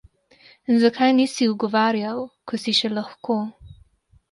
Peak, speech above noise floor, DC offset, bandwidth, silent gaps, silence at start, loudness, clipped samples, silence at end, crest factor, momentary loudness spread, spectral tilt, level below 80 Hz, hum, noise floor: -6 dBFS; 36 dB; under 0.1%; 11.5 kHz; none; 0.7 s; -21 LUFS; under 0.1%; 0.6 s; 16 dB; 13 LU; -4.5 dB/octave; -58 dBFS; none; -57 dBFS